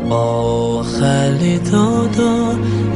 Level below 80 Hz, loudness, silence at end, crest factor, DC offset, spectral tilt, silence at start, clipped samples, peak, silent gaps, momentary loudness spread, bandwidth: -38 dBFS; -15 LUFS; 0 s; 14 dB; under 0.1%; -6.5 dB/octave; 0 s; under 0.1%; -2 dBFS; none; 3 LU; 11 kHz